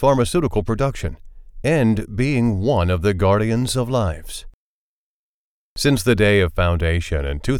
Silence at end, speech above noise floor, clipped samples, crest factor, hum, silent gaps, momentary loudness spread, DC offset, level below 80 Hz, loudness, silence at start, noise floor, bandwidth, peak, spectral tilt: 0 s; over 72 dB; under 0.1%; 16 dB; none; 4.54-5.76 s; 10 LU; under 0.1%; -32 dBFS; -19 LUFS; 0 s; under -90 dBFS; 17.5 kHz; -2 dBFS; -6 dB/octave